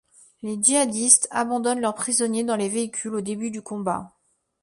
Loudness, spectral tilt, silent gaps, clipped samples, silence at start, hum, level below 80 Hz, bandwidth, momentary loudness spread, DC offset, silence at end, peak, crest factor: -22 LUFS; -2.5 dB/octave; none; under 0.1%; 0.45 s; none; -66 dBFS; 11.5 kHz; 14 LU; under 0.1%; 0.55 s; -2 dBFS; 22 dB